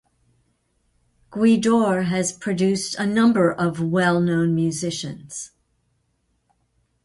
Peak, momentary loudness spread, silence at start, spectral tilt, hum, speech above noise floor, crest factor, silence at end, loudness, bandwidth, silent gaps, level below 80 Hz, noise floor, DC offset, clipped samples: -6 dBFS; 15 LU; 1.3 s; -5.5 dB/octave; none; 49 dB; 16 dB; 1.6 s; -20 LUFS; 11.5 kHz; none; -58 dBFS; -69 dBFS; under 0.1%; under 0.1%